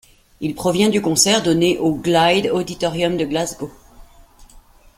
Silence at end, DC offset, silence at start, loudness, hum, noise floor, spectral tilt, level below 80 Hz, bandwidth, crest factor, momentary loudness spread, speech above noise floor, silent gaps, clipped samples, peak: 0.4 s; under 0.1%; 0.4 s; -17 LUFS; none; -47 dBFS; -4 dB/octave; -48 dBFS; 16.5 kHz; 18 dB; 12 LU; 29 dB; none; under 0.1%; -2 dBFS